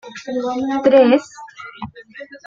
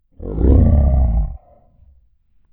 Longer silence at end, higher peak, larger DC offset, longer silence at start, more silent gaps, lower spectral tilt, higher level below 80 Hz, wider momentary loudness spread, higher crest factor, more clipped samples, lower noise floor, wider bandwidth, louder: second, 0.1 s vs 1.15 s; about the same, -2 dBFS vs 0 dBFS; neither; second, 0.05 s vs 0.2 s; neither; second, -5.5 dB/octave vs -14.5 dB/octave; second, -58 dBFS vs -18 dBFS; first, 24 LU vs 14 LU; about the same, 16 dB vs 16 dB; neither; second, -38 dBFS vs -55 dBFS; first, 7.6 kHz vs 2.2 kHz; about the same, -16 LUFS vs -16 LUFS